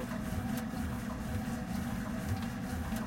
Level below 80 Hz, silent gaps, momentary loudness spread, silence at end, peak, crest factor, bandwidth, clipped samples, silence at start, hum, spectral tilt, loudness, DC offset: -46 dBFS; none; 1 LU; 0 s; -24 dBFS; 14 dB; 16.5 kHz; under 0.1%; 0 s; none; -6 dB/octave; -37 LUFS; under 0.1%